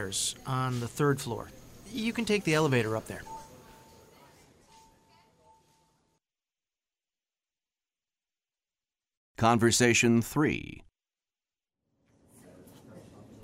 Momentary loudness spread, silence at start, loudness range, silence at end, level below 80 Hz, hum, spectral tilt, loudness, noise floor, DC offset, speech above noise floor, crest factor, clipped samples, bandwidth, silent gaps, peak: 20 LU; 0 s; 9 LU; 0.1 s; -60 dBFS; none; -4.5 dB/octave; -28 LUFS; under -90 dBFS; under 0.1%; over 62 dB; 22 dB; under 0.1%; 16 kHz; 9.17-9.35 s; -10 dBFS